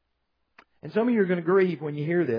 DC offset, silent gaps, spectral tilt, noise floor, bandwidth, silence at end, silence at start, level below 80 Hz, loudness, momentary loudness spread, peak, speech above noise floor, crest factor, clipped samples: under 0.1%; none; -10 dB/octave; -76 dBFS; 5.2 kHz; 0 s; 0.85 s; -78 dBFS; -25 LUFS; 8 LU; -10 dBFS; 52 dB; 16 dB; under 0.1%